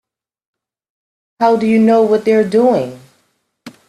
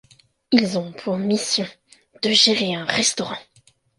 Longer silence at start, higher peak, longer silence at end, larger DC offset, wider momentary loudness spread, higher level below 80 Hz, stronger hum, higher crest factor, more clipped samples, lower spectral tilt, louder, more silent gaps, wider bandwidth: first, 1.4 s vs 0.5 s; about the same, 0 dBFS vs 0 dBFS; second, 0.2 s vs 0.55 s; neither; second, 6 LU vs 13 LU; about the same, -60 dBFS vs -64 dBFS; neither; second, 16 dB vs 22 dB; neither; first, -7 dB/octave vs -3 dB/octave; first, -13 LUFS vs -20 LUFS; neither; about the same, 12 kHz vs 11.5 kHz